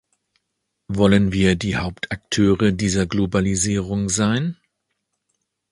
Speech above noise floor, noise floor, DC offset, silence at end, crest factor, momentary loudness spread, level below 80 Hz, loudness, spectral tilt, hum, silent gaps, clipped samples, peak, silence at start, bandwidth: 58 dB; -76 dBFS; under 0.1%; 1.2 s; 20 dB; 9 LU; -40 dBFS; -20 LUFS; -5 dB/octave; none; none; under 0.1%; -2 dBFS; 0.9 s; 11.5 kHz